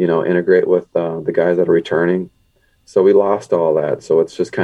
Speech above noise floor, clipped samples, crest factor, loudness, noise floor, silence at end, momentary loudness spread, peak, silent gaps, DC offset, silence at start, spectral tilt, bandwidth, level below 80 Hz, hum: 43 dB; under 0.1%; 14 dB; -16 LUFS; -58 dBFS; 0 s; 7 LU; -2 dBFS; none; under 0.1%; 0 s; -7.5 dB/octave; 9.2 kHz; -58 dBFS; none